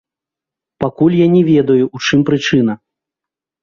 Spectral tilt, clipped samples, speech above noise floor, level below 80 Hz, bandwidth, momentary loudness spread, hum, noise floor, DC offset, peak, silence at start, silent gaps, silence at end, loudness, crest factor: -6.5 dB/octave; under 0.1%; 74 dB; -50 dBFS; 7.2 kHz; 11 LU; none; -86 dBFS; under 0.1%; 0 dBFS; 0.8 s; none; 0.85 s; -13 LUFS; 14 dB